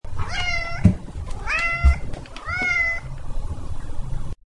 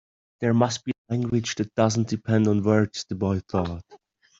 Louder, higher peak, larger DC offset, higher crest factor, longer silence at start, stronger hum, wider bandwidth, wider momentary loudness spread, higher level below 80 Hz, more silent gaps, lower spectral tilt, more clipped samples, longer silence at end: about the same, -23 LUFS vs -25 LUFS; about the same, -2 dBFS vs -4 dBFS; first, 0.4% vs under 0.1%; about the same, 20 dB vs 20 dB; second, 0.05 s vs 0.4 s; neither; first, 11 kHz vs 7.8 kHz; first, 15 LU vs 8 LU; first, -28 dBFS vs -56 dBFS; second, none vs 0.98-1.05 s; about the same, -5.5 dB/octave vs -6 dB/octave; neither; second, 0.15 s vs 0.45 s